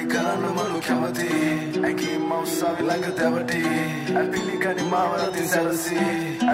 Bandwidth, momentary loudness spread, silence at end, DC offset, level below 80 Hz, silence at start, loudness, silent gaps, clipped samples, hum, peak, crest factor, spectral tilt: 16 kHz; 2 LU; 0 s; under 0.1%; -62 dBFS; 0 s; -24 LUFS; none; under 0.1%; none; -8 dBFS; 14 dB; -4.5 dB/octave